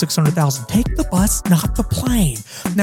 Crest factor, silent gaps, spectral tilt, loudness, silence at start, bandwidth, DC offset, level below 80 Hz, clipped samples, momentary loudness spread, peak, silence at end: 14 dB; none; -5 dB/octave; -18 LUFS; 0 s; 17.5 kHz; under 0.1%; -26 dBFS; under 0.1%; 5 LU; -4 dBFS; 0 s